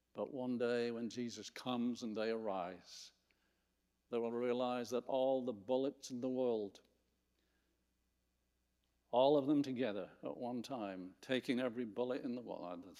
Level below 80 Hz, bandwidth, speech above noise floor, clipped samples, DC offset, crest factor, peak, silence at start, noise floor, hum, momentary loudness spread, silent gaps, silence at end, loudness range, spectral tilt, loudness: -84 dBFS; 13.5 kHz; 44 dB; under 0.1%; under 0.1%; 20 dB; -20 dBFS; 0.15 s; -83 dBFS; 60 Hz at -80 dBFS; 11 LU; none; 0 s; 5 LU; -5.5 dB/octave; -40 LUFS